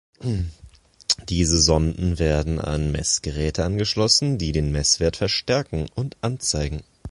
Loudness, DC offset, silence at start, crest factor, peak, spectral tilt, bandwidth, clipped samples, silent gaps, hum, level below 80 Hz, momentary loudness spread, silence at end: -22 LUFS; under 0.1%; 0.2 s; 20 dB; -2 dBFS; -4 dB/octave; 11.5 kHz; under 0.1%; none; none; -32 dBFS; 11 LU; 0 s